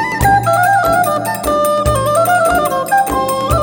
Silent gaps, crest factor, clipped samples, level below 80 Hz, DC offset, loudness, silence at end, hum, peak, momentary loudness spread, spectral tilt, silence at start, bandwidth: none; 12 dB; under 0.1%; -28 dBFS; under 0.1%; -13 LUFS; 0 s; none; 0 dBFS; 4 LU; -4.5 dB/octave; 0 s; over 20 kHz